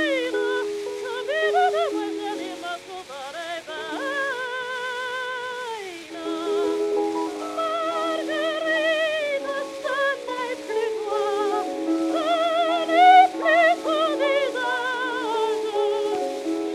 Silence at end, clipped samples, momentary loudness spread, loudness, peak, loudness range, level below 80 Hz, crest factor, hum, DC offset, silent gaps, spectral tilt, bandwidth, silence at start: 0 s; under 0.1%; 13 LU; -23 LUFS; -4 dBFS; 10 LU; -70 dBFS; 20 dB; none; under 0.1%; none; -2 dB/octave; 14 kHz; 0 s